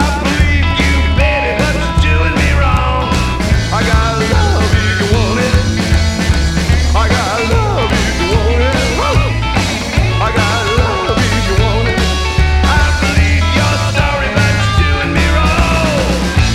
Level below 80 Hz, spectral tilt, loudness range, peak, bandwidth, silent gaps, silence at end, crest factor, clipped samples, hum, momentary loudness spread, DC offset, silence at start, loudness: -16 dBFS; -5 dB/octave; 1 LU; 0 dBFS; 13.5 kHz; none; 0 s; 12 dB; under 0.1%; none; 2 LU; under 0.1%; 0 s; -12 LUFS